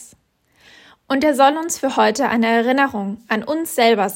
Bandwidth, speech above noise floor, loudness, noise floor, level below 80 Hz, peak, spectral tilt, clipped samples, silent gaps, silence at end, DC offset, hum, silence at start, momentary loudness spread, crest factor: 16.5 kHz; 42 dB; -17 LUFS; -59 dBFS; -60 dBFS; -2 dBFS; -3.5 dB/octave; under 0.1%; none; 0 s; under 0.1%; none; 0 s; 8 LU; 16 dB